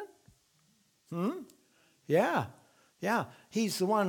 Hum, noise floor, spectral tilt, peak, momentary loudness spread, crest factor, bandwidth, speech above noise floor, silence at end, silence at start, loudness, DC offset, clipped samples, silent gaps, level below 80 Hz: none; -70 dBFS; -5 dB/octave; -14 dBFS; 16 LU; 20 dB; 19.5 kHz; 39 dB; 0 s; 0 s; -33 LUFS; under 0.1%; under 0.1%; none; -78 dBFS